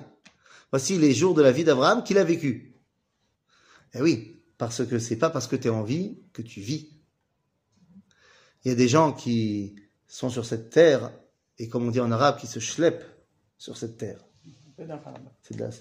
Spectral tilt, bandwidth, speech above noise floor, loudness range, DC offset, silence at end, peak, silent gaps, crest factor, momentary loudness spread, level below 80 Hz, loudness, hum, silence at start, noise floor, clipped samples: -5.5 dB/octave; 15.5 kHz; 51 dB; 8 LU; under 0.1%; 0 s; -4 dBFS; none; 22 dB; 21 LU; -66 dBFS; -24 LUFS; none; 0 s; -75 dBFS; under 0.1%